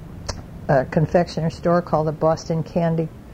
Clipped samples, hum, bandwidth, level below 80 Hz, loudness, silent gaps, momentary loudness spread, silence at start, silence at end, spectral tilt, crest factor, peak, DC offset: under 0.1%; none; 8.8 kHz; -42 dBFS; -21 LUFS; none; 13 LU; 0 s; 0 s; -7.5 dB/octave; 16 dB; -4 dBFS; under 0.1%